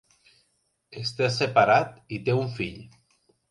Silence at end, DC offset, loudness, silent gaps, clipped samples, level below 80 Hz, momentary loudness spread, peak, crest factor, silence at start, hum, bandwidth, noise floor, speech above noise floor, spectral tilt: 0.65 s; under 0.1%; -25 LUFS; none; under 0.1%; -60 dBFS; 14 LU; -4 dBFS; 22 dB; 0.9 s; none; 11.5 kHz; -72 dBFS; 48 dB; -5.5 dB/octave